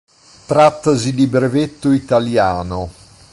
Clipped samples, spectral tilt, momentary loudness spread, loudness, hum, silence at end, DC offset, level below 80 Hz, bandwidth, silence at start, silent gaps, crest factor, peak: under 0.1%; -6.5 dB/octave; 11 LU; -15 LUFS; none; 0.4 s; under 0.1%; -40 dBFS; 11.5 kHz; 0.5 s; none; 14 dB; -2 dBFS